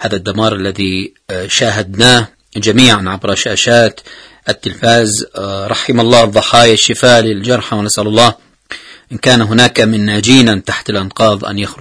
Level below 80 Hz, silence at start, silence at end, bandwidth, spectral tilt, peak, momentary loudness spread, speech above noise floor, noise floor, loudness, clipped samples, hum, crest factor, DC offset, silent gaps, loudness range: -42 dBFS; 0 s; 0.05 s; 11 kHz; -4 dB/octave; 0 dBFS; 13 LU; 21 dB; -31 dBFS; -10 LUFS; 1%; none; 12 dB; under 0.1%; none; 2 LU